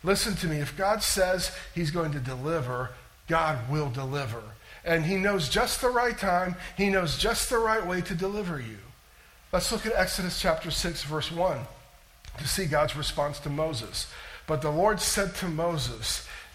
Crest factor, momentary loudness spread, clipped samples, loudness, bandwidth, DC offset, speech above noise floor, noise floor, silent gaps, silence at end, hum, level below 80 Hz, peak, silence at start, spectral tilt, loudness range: 18 dB; 10 LU; under 0.1%; -28 LUFS; 16.5 kHz; under 0.1%; 27 dB; -55 dBFS; none; 0 s; none; -44 dBFS; -12 dBFS; 0 s; -4 dB/octave; 4 LU